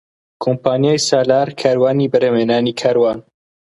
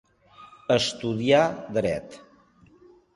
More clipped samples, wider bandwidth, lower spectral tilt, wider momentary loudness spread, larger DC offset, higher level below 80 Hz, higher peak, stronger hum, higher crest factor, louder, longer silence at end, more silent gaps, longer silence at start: neither; about the same, 11.5 kHz vs 11.5 kHz; about the same, -5 dB/octave vs -5 dB/octave; second, 5 LU vs 15 LU; neither; about the same, -58 dBFS vs -58 dBFS; first, 0 dBFS vs -6 dBFS; neither; about the same, 16 dB vs 20 dB; first, -15 LUFS vs -24 LUFS; second, 0.55 s vs 1 s; neither; about the same, 0.4 s vs 0.4 s